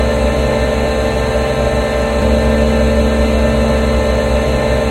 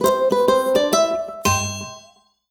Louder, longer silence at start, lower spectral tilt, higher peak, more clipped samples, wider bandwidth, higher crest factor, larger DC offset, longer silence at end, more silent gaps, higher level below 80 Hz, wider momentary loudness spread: first, -14 LUFS vs -19 LUFS; about the same, 0 s vs 0 s; first, -6 dB/octave vs -3.5 dB/octave; first, 0 dBFS vs -4 dBFS; neither; second, 12.5 kHz vs over 20 kHz; about the same, 12 dB vs 16 dB; neither; second, 0 s vs 0.5 s; neither; first, -18 dBFS vs -50 dBFS; second, 2 LU vs 11 LU